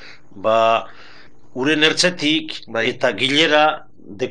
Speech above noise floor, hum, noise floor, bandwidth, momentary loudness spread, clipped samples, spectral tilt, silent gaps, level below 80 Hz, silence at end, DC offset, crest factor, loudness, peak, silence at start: 28 dB; none; -46 dBFS; 11 kHz; 12 LU; under 0.1%; -3 dB/octave; none; -64 dBFS; 0 s; 2%; 18 dB; -17 LUFS; -2 dBFS; 0 s